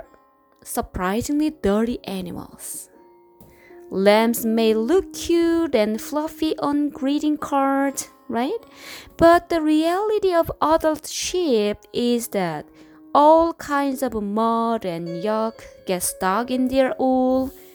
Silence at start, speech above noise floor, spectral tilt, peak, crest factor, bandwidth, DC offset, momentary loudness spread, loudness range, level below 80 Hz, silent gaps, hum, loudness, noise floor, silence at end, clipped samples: 0.65 s; 35 dB; -4.5 dB/octave; -2 dBFS; 18 dB; over 20 kHz; under 0.1%; 13 LU; 4 LU; -48 dBFS; none; none; -21 LUFS; -56 dBFS; 0.1 s; under 0.1%